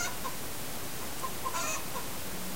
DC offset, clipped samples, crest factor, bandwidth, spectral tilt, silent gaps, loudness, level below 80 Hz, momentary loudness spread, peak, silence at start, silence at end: 2%; under 0.1%; 16 dB; 16 kHz; -2 dB/octave; none; -36 LUFS; -54 dBFS; 5 LU; -20 dBFS; 0 s; 0 s